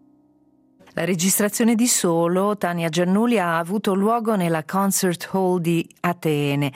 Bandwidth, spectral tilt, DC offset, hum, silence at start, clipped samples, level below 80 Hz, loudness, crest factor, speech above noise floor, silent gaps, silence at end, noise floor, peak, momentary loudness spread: 16 kHz; -4.5 dB/octave; under 0.1%; none; 0.95 s; under 0.1%; -66 dBFS; -20 LUFS; 14 dB; 38 dB; none; 0.05 s; -58 dBFS; -6 dBFS; 5 LU